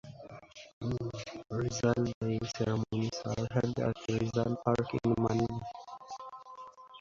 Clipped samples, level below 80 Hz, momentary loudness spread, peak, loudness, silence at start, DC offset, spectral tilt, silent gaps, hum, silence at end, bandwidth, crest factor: under 0.1%; -58 dBFS; 19 LU; -14 dBFS; -33 LUFS; 0.05 s; under 0.1%; -6.5 dB/octave; 0.73-0.81 s, 2.14-2.21 s; none; 0 s; 7.6 kHz; 20 dB